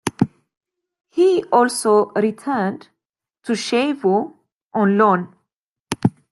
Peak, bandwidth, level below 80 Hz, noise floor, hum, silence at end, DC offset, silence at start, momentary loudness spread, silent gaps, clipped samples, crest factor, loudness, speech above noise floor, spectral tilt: 0 dBFS; 12.5 kHz; -62 dBFS; -77 dBFS; none; 0.25 s; under 0.1%; 0.05 s; 13 LU; 0.57-0.61 s, 3.09-3.14 s, 4.52-4.71 s, 5.58-5.85 s; under 0.1%; 20 dB; -19 LUFS; 60 dB; -5.5 dB/octave